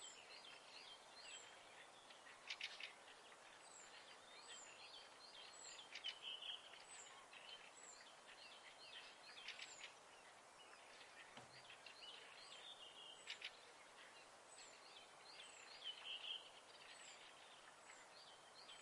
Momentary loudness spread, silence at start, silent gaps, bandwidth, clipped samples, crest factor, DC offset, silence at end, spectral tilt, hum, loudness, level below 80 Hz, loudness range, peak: 11 LU; 0 s; none; 12 kHz; under 0.1%; 22 dB; under 0.1%; 0 s; 0.5 dB/octave; none; -57 LUFS; under -90 dBFS; 4 LU; -36 dBFS